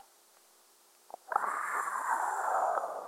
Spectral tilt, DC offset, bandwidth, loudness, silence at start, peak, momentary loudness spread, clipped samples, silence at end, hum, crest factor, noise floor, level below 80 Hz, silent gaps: -0.5 dB/octave; under 0.1%; 17 kHz; -33 LUFS; 1.3 s; -12 dBFS; 8 LU; under 0.1%; 0 s; none; 22 dB; -63 dBFS; under -90 dBFS; none